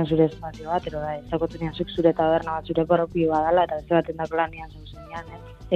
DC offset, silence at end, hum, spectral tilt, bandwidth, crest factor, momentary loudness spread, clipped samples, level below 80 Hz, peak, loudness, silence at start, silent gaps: under 0.1%; 0 s; none; -8 dB/octave; 7.8 kHz; 18 dB; 17 LU; under 0.1%; -46 dBFS; -6 dBFS; -24 LUFS; 0 s; none